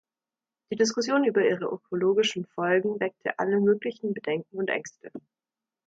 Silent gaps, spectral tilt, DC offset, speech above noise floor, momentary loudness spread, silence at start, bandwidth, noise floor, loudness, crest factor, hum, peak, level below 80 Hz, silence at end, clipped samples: none; -4.5 dB/octave; under 0.1%; over 64 dB; 10 LU; 0.7 s; 7.8 kHz; under -90 dBFS; -26 LUFS; 16 dB; none; -10 dBFS; -76 dBFS; 0.65 s; under 0.1%